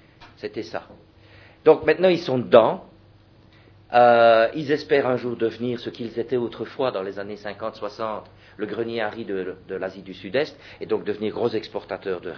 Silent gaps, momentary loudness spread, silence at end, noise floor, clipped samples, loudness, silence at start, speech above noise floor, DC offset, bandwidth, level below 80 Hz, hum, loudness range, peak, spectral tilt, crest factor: none; 17 LU; 0 s; -52 dBFS; under 0.1%; -22 LUFS; 0.2 s; 30 dB; under 0.1%; 5.4 kHz; -60 dBFS; none; 10 LU; 0 dBFS; -7 dB/octave; 22 dB